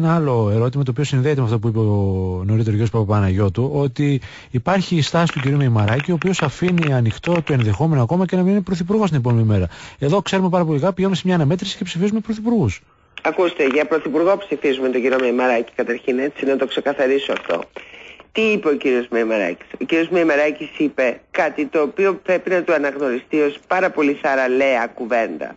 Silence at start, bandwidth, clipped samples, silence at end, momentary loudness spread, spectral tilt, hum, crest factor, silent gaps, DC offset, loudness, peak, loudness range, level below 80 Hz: 0 s; 8 kHz; under 0.1%; 0.05 s; 5 LU; -7 dB/octave; none; 12 dB; none; under 0.1%; -19 LUFS; -6 dBFS; 2 LU; -48 dBFS